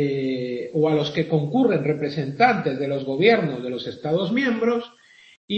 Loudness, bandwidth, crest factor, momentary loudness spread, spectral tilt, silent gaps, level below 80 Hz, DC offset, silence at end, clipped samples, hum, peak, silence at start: -22 LUFS; 7.8 kHz; 18 dB; 9 LU; -7.5 dB/octave; 5.37-5.48 s; -66 dBFS; under 0.1%; 0 s; under 0.1%; none; -4 dBFS; 0 s